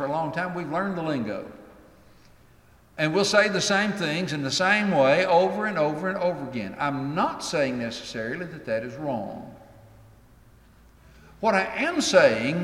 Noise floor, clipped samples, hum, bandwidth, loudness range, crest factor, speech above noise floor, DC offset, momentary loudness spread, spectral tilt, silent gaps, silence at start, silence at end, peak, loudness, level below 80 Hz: -55 dBFS; under 0.1%; none; 14 kHz; 10 LU; 22 dB; 31 dB; under 0.1%; 12 LU; -4.5 dB/octave; none; 0 s; 0 s; -4 dBFS; -24 LUFS; -60 dBFS